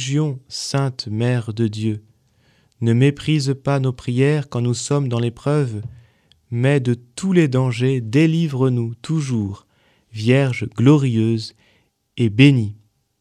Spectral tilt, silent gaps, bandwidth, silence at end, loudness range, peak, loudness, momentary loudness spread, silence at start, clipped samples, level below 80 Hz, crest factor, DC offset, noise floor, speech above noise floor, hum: -6.5 dB/octave; none; 11 kHz; 0.45 s; 3 LU; 0 dBFS; -19 LUFS; 11 LU; 0 s; under 0.1%; -56 dBFS; 18 dB; under 0.1%; -61 dBFS; 43 dB; none